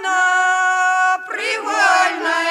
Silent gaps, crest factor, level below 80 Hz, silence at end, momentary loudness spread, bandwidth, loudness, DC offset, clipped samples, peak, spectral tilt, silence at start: none; 16 dB; -70 dBFS; 0 s; 6 LU; 13.5 kHz; -16 LUFS; under 0.1%; under 0.1%; -2 dBFS; 1 dB/octave; 0 s